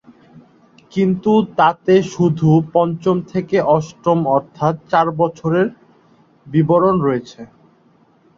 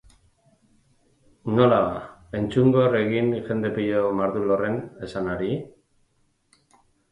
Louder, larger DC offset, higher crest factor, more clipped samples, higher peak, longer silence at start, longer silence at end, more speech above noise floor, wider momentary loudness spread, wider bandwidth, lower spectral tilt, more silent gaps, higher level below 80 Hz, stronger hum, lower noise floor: first, -16 LUFS vs -23 LUFS; neither; about the same, 16 dB vs 20 dB; neither; first, -2 dBFS vs -6 dBFS; second, 0.35 s vs 1.45 s; second, 0.95 s vs 1.4 s; second, 38 dB vs 45 dB; second, 7 LU vs 13 LU; second, 7.4 kHz vs 11 kHz; about the same, -8 dB/octave vs -8.5 dB/octave; neither; about the same, -54 dBFS vs -54 dBFS; neither; second, -54 dBFS vs -67 dBFS